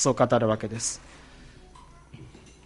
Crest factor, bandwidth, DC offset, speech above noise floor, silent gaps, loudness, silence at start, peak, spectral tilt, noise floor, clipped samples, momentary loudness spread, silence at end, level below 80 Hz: 20 dB; 11.5 kHz; under 0.1%; 25 dB; none; -25 LUFS; 0 s; -8 dBFS; -4.5 dB/octave; -50 dBFS; under 0.1%; 26 LU; 0.35 s; -52 dBFS